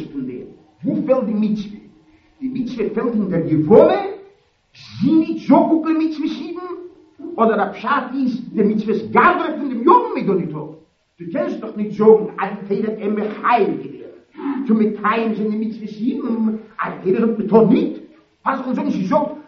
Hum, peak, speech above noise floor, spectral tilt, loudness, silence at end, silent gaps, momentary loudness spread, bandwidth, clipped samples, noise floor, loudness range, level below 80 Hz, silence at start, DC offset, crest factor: none; 0 dBFS; 36 dB; -6.5 dB/octave; -18 LUFS; 0.05 s; none; 16 LU; 6.4 kHz; under 0.1%; -53 dBFS; 4 LU; -58 dBFS; 0 s; under 0.1%; 18 dB